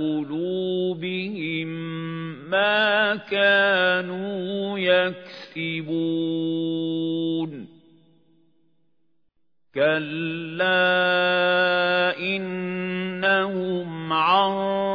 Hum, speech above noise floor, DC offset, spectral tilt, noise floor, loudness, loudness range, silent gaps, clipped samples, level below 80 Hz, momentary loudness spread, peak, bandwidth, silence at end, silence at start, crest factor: none; 50 dB; under 0.1%; -7.5 dB/octave; -73 dBFS; -23 LUFS; 8 LU; none; under 0.1%; -74 dBFS; 10 LU; -6 dBFS; 5.4 kHz; 0 s; 0 s; 18 dB